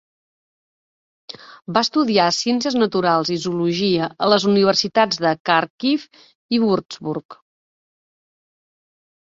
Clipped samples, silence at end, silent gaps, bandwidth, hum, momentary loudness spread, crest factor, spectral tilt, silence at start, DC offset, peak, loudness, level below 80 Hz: under 0.1%; 1.95 s; 5.40-5.45 s, 5.70-5.78 s, 6.35-6.49 s, 7.25-7.29 s; 7.8 kHz; none; 12 LU; 20 dB; -4.5 dB/octave; 1.45 s; under 0.1%; -2 dBFS; -19 LUFS; -62 dBFS